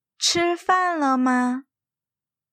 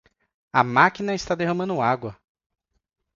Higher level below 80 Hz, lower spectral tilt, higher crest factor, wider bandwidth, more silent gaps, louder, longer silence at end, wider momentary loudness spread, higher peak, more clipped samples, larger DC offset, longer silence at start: second, -66 dBFS vs -56 dBFS; second, -2 dB/octave vs -5.5 dB/octave; second, 16 dB vs 24 dB; first, 15 kHz vs 7.8 kHz; neither; about the same, -21 LUFS vs -22 LUFS; about the same, 0.9 s vs 1 s; second, 5 LU vs 10 LU; second, -6 dBFS vs -2 dBFS; neither; neither; second, 0.2 s vs 0.55 s